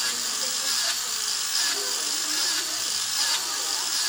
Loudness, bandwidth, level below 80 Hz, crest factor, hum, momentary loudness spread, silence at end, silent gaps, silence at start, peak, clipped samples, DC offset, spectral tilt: -23 LUFS; 17 kHz; -68 dBFS; 16 dB; none; 2 LU; 0 s; none; 0 s; -10 dBFS; under 0.1%; under 0.1%; 2.5 dB/octave